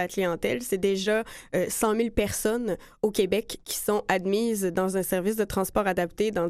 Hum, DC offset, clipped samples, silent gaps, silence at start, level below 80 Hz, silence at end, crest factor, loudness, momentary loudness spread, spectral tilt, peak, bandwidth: none; under 0.1%; under 0.1%; none; 0 s; -48 dBFS; 0 s; 18 dB; -27 LUFS; 5 LU; -4.5 dB/octave; -8 dBFS; 15.5 kHz